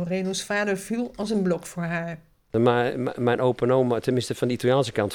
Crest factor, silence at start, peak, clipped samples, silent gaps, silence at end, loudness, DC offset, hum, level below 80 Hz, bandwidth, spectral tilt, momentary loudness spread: 18 dB; 0 s; -6 dBFS; under 0.1%; none; 0 s; -24 LUFS; under 0.1%; none; -58 dBFS; 19 kHz; -5.5 dB/octave; 8 LU